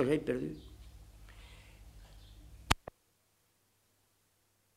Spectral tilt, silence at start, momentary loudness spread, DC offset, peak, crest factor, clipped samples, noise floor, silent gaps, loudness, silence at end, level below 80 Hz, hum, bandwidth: -5 dB/octave; 0 s; 23 LU; under 0.1%; -6 dBFS; 34 dB; under 0.1%; -74 dBFS; none; -35 LUFS; 2 s; -54 dBFS; none; 16 kHz